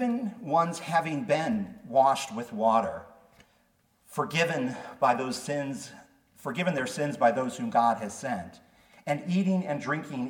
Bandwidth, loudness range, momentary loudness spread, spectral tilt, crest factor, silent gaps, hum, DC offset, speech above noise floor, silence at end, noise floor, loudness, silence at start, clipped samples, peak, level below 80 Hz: 18 kHz; 3 LU; 11 LU; -5.5 dB/octave; 18 dB; none; none; under 0.1%; 40 dB; 0 s; -68 dBFS; -28 LUFS; 0 s; under 0.1%; -10 dBFS; -70 dBFS